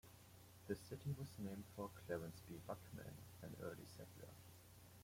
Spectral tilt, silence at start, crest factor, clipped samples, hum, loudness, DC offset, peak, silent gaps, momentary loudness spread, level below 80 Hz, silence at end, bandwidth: -6 dB/octave; 0.05 s; 22 dB; under 0.1%; none; -53 LUFS; under 0.1%; -32 dBFS; none; 14 LU; -76 dBFS; 0 s; 16.5 kHz